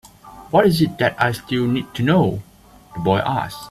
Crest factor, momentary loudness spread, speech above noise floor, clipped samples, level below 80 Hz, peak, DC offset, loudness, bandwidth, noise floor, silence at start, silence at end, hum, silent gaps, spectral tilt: 18 dB; 8 LU; 25 dB; under 0.1%; -48 dBFS; -2 dBFS; under 0.1%; -19 LUFS; 14.5 kHz; -44 dBFS; 0.25 s; 0 s; none; none; -6.5 dB/octave